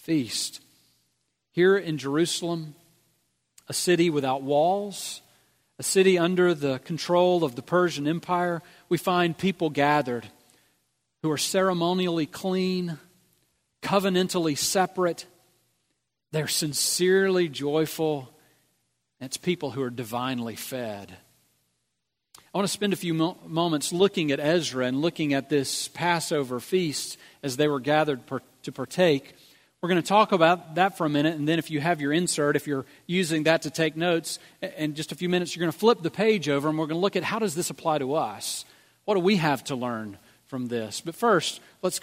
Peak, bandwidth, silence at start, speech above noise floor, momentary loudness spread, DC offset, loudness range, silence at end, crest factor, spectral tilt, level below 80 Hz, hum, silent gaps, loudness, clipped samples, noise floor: -4 dBFS; 16 kHz; 0.1 s; 55 dB; 12 LU; under 0.1%; 4 LU; 0.05 s; 22 dB; -4.5 dB/octave; -70 dBFS; none; none; -25 LUFS; under 0.1%; -81 dBFS